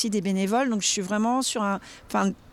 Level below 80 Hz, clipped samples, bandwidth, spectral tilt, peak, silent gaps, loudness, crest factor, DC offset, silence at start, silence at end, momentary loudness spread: -60 dBFS; under 0.1%; 15 kHz; -4 dB/octave; -12 dBFS; none; -25 LUFS; 14 dB; under 0.1%; 0 s; 0.15 s; 5 LU